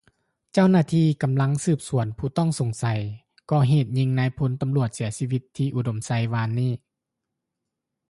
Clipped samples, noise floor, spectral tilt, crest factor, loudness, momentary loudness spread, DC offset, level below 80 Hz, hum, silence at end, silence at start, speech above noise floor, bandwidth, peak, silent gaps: under 0.1%; -83 dBFS; -7 dB/octave; 16 dB; -24 LUFS; 9 LU; under 0.1%; -54 dBFS; none; 1.35 s; 0.55 s; 61 dB; 11.5 kHz; -8 dBFS; none